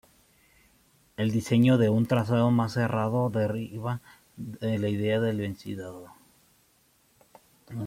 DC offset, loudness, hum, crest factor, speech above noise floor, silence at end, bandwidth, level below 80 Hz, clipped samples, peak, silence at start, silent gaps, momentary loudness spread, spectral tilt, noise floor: under 0.1%; -27 LUFS; none; 18 dB; 39 dB; 0 s; 15.5 kHz; -64 dBFS; under 0.1%; -10 dBFS; 1.2 s; none; 19 LU; -7.5 dB/octave; -65 dBFS